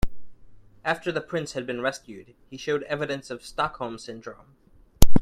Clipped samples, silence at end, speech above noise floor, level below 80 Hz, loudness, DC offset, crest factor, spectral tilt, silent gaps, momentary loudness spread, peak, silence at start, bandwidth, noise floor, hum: under 0.1%; 0 s; 18 dB; -34 dBFS; -30 LUFS; under 0.1%; 22 dB; -5 dB/octave; none; 16 LU; 0 dBFS; 0.05 s; 13.5 kHz; -48 dBFS; none